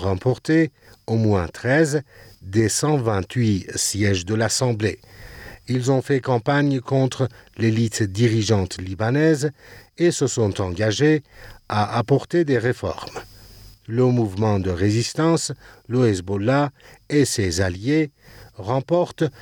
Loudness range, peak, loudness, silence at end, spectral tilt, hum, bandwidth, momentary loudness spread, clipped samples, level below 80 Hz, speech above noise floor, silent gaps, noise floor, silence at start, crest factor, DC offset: 2 LU; -6 dBFS; -21 LUFS; 0 s; -5.5 dB/octave; none; 18.5 kHz; 8 LU; under 0.1%; -52 dBFS; 24 dB; none; -45 dBFS; 0 s; 14 dB; under 0.1%